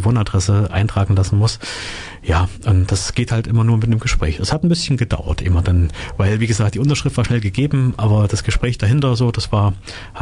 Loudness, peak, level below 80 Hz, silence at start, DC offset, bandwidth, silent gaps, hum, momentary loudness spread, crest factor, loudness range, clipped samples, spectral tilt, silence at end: -17 LUFS; -6 dBFS; -30 dBFS; 0 s; under 0.1%; 11 kHz; none; none; 5 LU; 10 dB; 1 LU; under 0.1%; -6 dB/octave; 0 s